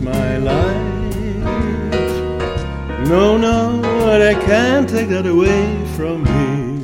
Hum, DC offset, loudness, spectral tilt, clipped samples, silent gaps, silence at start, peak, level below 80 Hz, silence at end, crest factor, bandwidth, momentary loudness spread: none; under 0.1%; -16 LUFS; -6.5 dB/octave; under 0.1%; none; 0 s; 0 dBFS; -28 dBFS; 0 s; 14 dB; 17 kHz; 9 LU